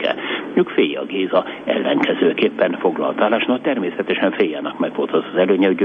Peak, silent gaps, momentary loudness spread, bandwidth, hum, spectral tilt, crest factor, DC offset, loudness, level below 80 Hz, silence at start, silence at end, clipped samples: -2 dBFS; none; 5 LU; 6.6 kHz; none; -7.5 dB/octave; 16 dB; under 0.1%; -19 LUFS; -66 dBFS; 0 s; 0 s; under 0.1%